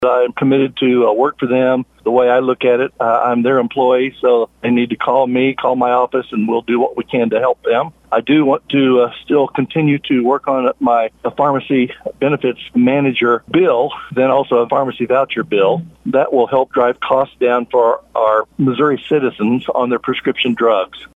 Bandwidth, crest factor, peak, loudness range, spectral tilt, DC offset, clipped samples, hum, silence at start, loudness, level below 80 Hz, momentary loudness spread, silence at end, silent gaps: 4 kHz; 14 dB; 0 dBFS; 1 LU; -8 dB/octave; under 0.1%; under 0.1%; none; 0 s; -15 LUFS; -56 dBFS; 4 LU; 0.1 s; none